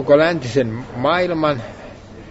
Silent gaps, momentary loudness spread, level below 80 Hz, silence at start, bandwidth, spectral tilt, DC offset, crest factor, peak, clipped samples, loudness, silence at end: none; 23 LU; -46 dBFS; 0 s; 8 kHz; -6.5 dB/octave; under 0.1%; 16 dB; -2 dBFS; under 0.1%; -18 LUFS; 0 s